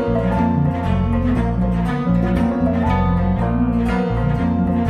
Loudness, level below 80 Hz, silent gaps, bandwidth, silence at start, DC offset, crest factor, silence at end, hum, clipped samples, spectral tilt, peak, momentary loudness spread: -18 LUFS; -26 dBFS; none; 9 kHz; 0 s; under 0.1%; 12 dB; 0 s; none; under 0.1%; -9.5 dB/octave; -6 dBFS; 2 LU